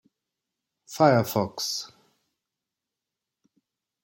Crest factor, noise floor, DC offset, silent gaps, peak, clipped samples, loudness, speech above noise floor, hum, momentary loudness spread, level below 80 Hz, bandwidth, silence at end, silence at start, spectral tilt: 24 dB; -87 dBFS; under 0.1%; none; -4 dBFS; under 0.1%; -24 LUFS; 64 dB; none; 20 LU; -68 dBFS; 16.5 kHz; 2.15 s; 0.9 s; -5 dB/octave